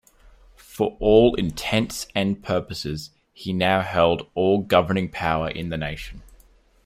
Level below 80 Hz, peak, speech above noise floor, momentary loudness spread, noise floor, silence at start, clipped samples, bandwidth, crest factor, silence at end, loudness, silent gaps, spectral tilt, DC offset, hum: -44 dBFS; -4 dBFS; 33 dB; 15 LU; -55 dBFS; 0.7 s; under 0.1%; 16 kHz; 20 dB; 0.65 s; -22 LUFS; none; -5.5 dB/octave; under 0.1%; none